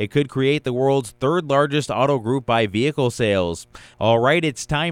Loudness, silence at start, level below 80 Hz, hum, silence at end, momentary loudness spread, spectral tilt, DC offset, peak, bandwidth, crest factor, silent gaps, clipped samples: -20 LUFS; 0 s; -48 dBFS; none; 0 s; 5 LU; -5.5 dB/octave; under 0.1%; -4 dBFS; 15 kHz; 16 dB; none; under 0.1%